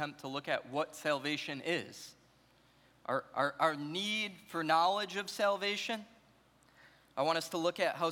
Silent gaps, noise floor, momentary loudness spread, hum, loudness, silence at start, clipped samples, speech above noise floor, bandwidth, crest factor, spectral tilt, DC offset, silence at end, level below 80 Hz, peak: none; -67 dBFS; 9 LU; none; -35 LUFS; 0 s; under 0.1%; 32 dB; 18 kHz; 20 dB; -3.5 dB/octave; under 0.1%; 0 s; -80 dBFS; -16 dBFS